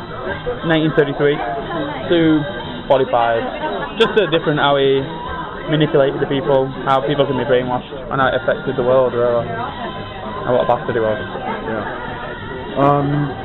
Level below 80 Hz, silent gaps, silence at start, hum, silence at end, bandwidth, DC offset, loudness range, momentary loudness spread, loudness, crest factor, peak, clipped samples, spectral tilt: -40 dBFS; none; 0 s; none; 0 s; 7.4 kHz; under 0.1%; 3 LU; 11 LU; -18 LUFS; 14 dB; -2 dBFS; under 0.1%; -8 dB/octave